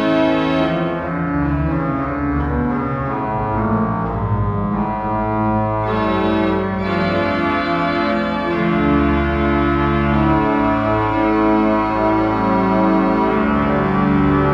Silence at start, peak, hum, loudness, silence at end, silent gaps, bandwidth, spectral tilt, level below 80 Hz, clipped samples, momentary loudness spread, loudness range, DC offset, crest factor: 0 s; -4 dBFS; none; -17 LUFS; 0 s; none; 7.2 kHz; -9 dB/octave; -30 dBFS; under 0.1%; 5 LU; 4 LU; under 0.1%; 14 dB